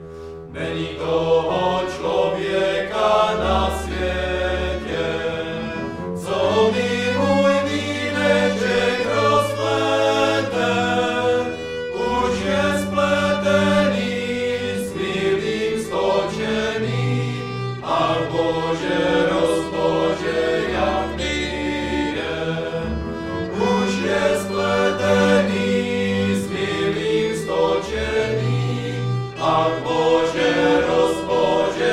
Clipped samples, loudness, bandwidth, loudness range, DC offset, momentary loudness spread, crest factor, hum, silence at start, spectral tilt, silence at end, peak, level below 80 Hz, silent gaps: under 0.1%; -20 LUFS; 14.5 kHz; 3 LU; under 0.1%; 7 LU; 16 dB; none; 0 s; -5.5 dB/octave; 0 s; -4 dBFS; -40 dBFS; none